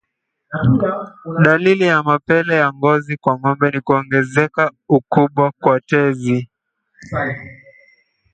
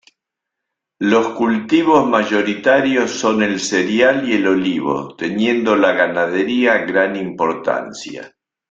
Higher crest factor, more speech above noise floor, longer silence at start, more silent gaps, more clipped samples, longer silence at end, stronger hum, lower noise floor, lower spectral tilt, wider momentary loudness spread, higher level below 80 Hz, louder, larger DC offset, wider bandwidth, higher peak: about the same, 16 dB vs 16 dB; second, 59 dB vs 65 dB; second, 0.5 s vs 1 s; neither; neither; first, 0.8 s vs 0.45 s; neither; second, -75 dBFS vs -81 dBFS; first, -7.5 dB/octave vs -4.5 dB/octave; about the same, 9 LU vs 8 LU; first, -50 dBFS vs -58 dBFS; about the same, -16 LUFS vs -16 LUFS; neither; about the same, 9 kHz vs 8.4 kHz; about the same, 0 dBFS vs -2 dBFS